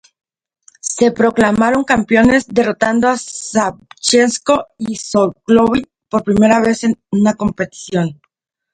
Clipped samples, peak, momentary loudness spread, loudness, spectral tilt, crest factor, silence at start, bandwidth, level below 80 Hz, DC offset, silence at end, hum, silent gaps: under 0.1%; 0 dBFS; 10 LU; -14 LUFS; -4.5 dB/octave; 14 dB; 0.85 s; 10.5 kHz; -44 dBFS; under 0.1%; 0.6 s; none; none